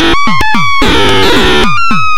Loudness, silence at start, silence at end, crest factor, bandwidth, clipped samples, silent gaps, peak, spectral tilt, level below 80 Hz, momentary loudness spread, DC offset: -8 LUFS; 0 s; 0 s; 6 dB; 17 kHz; 2%; none; 0 dBFS; -4 dB/octave; -20 dBFS; 3 LU; under 0.1%